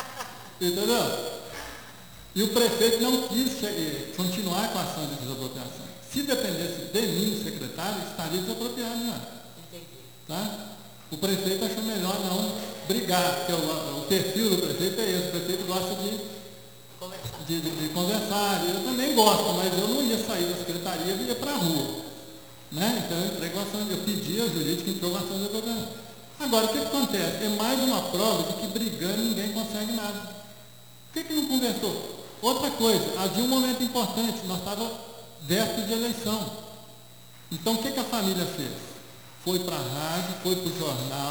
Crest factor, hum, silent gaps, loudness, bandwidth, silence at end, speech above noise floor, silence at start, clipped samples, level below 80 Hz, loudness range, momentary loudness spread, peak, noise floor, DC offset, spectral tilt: 26 dB; 60 Hz at -55 dBFS; none; -27 LUFS; over 20 kHz; 0 s; 23 dB; 0 s; under 0.1%; -62 dBFS; 5 LU; 16 LU; -2 dBFS; -50 dBFS; 0.2%; -4 dB/octave